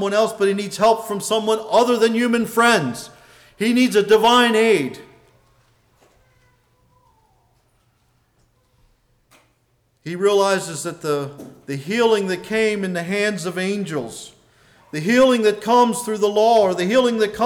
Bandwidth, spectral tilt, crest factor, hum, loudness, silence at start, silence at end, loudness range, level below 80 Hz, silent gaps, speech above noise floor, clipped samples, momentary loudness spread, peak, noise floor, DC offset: 19 kHz; -4 dB/octave; 14 dB; none; -18 LUFS; 0 s; 0 s; 8 LU; -60 dBFS; none; 46 dB; under 0.1%; 15 LU; -6 dBFS; -64 dBFS; under 0.1%